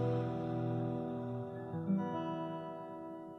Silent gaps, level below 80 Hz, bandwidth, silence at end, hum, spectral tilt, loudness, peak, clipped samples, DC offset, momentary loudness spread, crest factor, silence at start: none; -72 dBFS; 6.4 kHz; 0 s; none; -10 dB/octave; -39 LUFS; -24 dBFS; under 0.1%; under 0.1%; 9 LU; 14 dB; 0 s